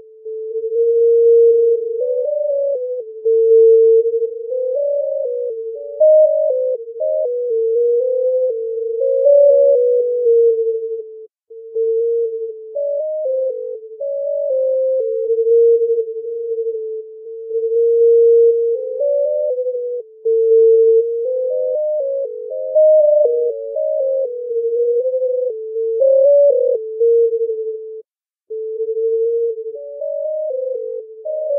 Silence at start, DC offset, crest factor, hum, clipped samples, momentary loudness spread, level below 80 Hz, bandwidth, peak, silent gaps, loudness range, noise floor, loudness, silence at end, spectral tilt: 0.25 s; under 0.1%; 12 dB; none; under 0.1%; 15 LU; under -90 dBFS; 0.8 kHz; -4 dBFS; none; 6 LU; -50 dBFS; -16 LUFS; 0 s; -7 dB/octave